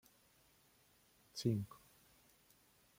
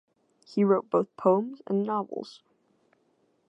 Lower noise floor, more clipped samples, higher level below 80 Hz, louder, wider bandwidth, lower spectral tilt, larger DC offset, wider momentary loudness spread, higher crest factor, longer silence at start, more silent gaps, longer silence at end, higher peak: about the same, -72 dBFS vs -70 dBFS; neither; first, -76 dBFS vs -82 dBFS; second, -43 LUFS vs -27 LUFS; first, 16.5 kHz vs 8 kHz; second, -6.5 dB/octave vs -9 dB/octave; neither; first, 27 LU vs 13 LU; about the same, 24 dB vs 20 dB; first, 1.35 s vs 0.5 s; neither; about the same, 1.25 s vs 1.15 s; second, -24 dBFS vs -10 dBFS